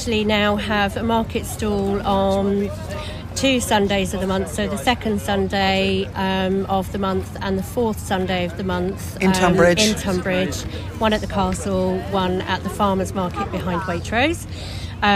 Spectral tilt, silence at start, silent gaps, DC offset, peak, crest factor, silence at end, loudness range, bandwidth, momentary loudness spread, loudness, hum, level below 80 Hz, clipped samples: -5 dB/octave; 0 s; none; under 0.1%; -2 dBFS; 18 dB; 0 s; 3 LU; 15.5 kHz; 7 LU; -21 LUFS; none; -36 dBFS; under 0.1%